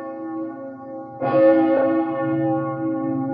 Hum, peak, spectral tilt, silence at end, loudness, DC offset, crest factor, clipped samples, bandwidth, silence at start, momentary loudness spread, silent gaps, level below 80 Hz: none; -4 dBFS; -11.5 dB/octave; 0 s; -20 LUFS; under 0.1%; 16 dB; under 0.1%; 4.8 kHz; 0 s; 19 LU; none; -70 dBFS